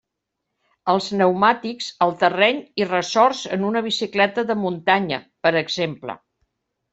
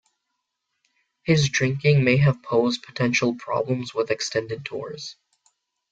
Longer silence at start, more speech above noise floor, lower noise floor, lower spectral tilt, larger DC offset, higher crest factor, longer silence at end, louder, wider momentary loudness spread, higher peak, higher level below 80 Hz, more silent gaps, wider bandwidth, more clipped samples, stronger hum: second, 0.85 s vs 1.25 s; about the same, 60 dB vs 57 dB; about the same, -80 dBFS vs -79 dBFS; about the same, -4.5 dB/octave vs -5.5 dB/octave; neither; about the same, 18 dB vs 20 dB; about the same, 0.75 s vs 0.8 s; about the same, -20 LUFS vs -22 LUFS; second, 10 LU vs 14 LU; about the same, -2 dBFS vs -4 dBFS; second, -66 dBFS vs -56 dBFS; neither; about the same, 8.2 kHz vs 7.8 kHz; neither; neither